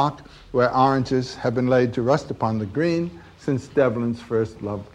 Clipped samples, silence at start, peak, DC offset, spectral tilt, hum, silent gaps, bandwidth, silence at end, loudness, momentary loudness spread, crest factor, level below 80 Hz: under 0.1%; 0 s; -4 dBFS; under 0.1%; -7.5 dB/octave; none; none; 10 kHz; 0.1 s; -23 LUFS; 8 LU; 18 dB; -50 dBFS